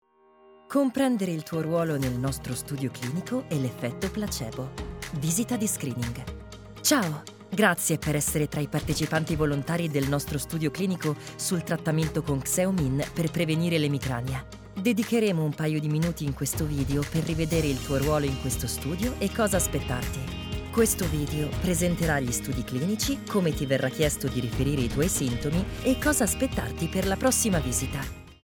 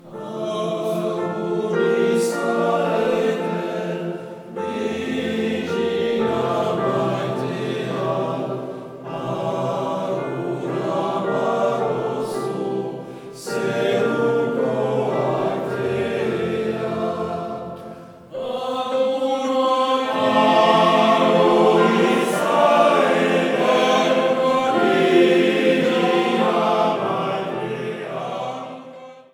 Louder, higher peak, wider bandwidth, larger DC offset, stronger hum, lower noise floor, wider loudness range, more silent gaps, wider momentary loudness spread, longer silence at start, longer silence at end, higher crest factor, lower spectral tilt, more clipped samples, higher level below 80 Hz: second, -27 LUFS vs -20 LUFS; second, -6 dBFS vs -2 dBFS; about the same, over 20 kHz vs 18.5 kHz; neither; neither; first, -57 dBFS vs -40 dBFS; second, 4 LU vs 8 LU; neither; second, 8 LU vs 13 LU; first, 0.7 s vs 0.05 s; about the same, 0.1 s vs 0.1 s; about the same, 20 dB vs 18 dB; about the same, -5 dB/octave vs -5.5 dB/octave; neither; first, -42 dBFS vs -62 dBFS